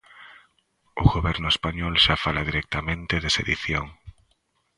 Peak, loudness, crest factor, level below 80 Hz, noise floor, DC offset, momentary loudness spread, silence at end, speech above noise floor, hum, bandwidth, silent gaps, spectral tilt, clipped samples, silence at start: -2 dBFS; -23 LUFS; 24 dB; -36 dBFS; -69 dBFS; under 0.1%; 9 LU; 0.7 s; 46 dB; none; 11.5 kHz; none; -4.5 dB/octave; under 0.1%; 0.15 s